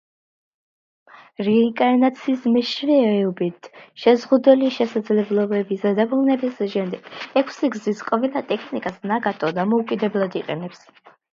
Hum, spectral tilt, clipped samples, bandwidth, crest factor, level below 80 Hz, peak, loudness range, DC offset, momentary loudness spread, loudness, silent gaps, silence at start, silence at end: none; -7 dB/octave; under 0.1%; 7.4 kHz; 20 dB; -70 dBFS; -2 dBFS; 5 LU; under 0.1%; 10 LU; -20 LUFS; none; 1.4 s; 0.55 s